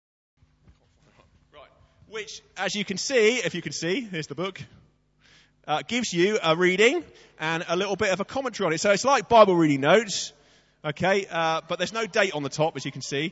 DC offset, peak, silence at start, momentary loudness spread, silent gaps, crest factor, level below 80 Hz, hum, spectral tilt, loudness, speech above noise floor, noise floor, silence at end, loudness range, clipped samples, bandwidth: under 0.1%; -4 dBFS; 1.55 s; 14 LU; none; 22 dB; -62 dBFS; none; -4 dB/octave; -24 LUFS; 37 dB; -61 dBFS; 0 s; 6 LU; under 0.1%; 8 kHz